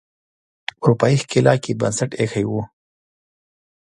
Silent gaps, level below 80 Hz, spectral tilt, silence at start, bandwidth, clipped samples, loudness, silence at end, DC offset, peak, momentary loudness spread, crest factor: none; -54 dBFS; -6 dB/octave; 0.8 s; 11 kHz; under 0.1%; -19 LUFS; 1.2 s; under 0.1%; 0 dBFS; 15 LU; 20 dB